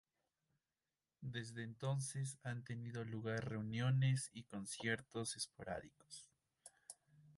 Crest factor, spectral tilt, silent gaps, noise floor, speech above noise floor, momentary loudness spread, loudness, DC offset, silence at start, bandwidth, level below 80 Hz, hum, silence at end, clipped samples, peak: 18 dB; -5 dB/octave; none; under -90 dBFS; over 47 dB; 19 LU; -44 LUFS; under 0.1%; 1.2 s; 11.5 kHz; -74 dBFS; none; 0.05 s; under 0.1%; -26 dBFS